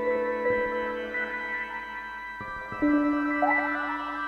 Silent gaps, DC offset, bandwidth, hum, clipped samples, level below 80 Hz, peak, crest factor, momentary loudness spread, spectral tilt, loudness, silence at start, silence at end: none; under 0.1%; 6.6 kHz; none; under 0.1%; -56 dBFS; -12 dBFS; 16 dB; 12 LU; -6.5 dB/octave; -28 LUFS; 0 s; 0 s